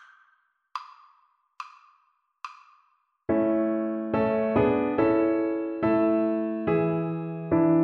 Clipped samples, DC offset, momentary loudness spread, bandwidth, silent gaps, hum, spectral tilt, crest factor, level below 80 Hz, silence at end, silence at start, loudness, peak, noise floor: under 0.1%; under 0.1%; 20 LU; 5.2 kHz; none; none; -9.5 dB/octave; 16 dB; -58 dBFS; 0 s; 0.75 s; -25 LUFS; -10 dBFS; -68 dBFS